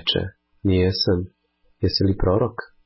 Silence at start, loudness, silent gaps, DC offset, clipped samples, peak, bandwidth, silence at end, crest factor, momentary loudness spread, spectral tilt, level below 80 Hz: 0.05 s; -22 LUFS; none; under 0.1%; under 0.1%; -8 dBFS; 5.8 kHz; 0.2 s; 14 dB; 8 LU; -9.5 dB/octave; -34 dBFS